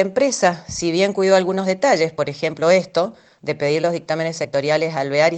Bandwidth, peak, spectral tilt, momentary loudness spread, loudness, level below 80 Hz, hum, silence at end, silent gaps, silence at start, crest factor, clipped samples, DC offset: 9 kHz; -2 dBFS; -4.5 dB/octave; 7 LU; -19 LUFS; -58 dBFS; none; 0 s; none; 0 s; 18 dB; under 0.1%; under 0.1%